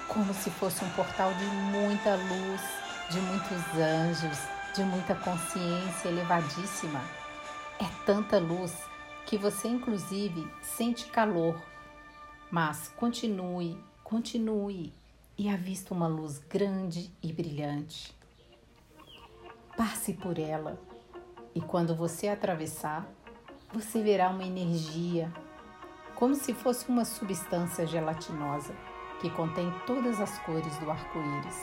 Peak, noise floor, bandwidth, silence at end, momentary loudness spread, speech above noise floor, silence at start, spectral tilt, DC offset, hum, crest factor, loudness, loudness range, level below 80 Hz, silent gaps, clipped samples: -12 dBFS; -59 dBFS; 16 kHz; 0 s; 16 LU; 27 dB; 0 s; -5 dB/octave; under 0.1%; none; 20 dB; -32 LUFS; 5 LU; -62 dBFS; none; under 0.1%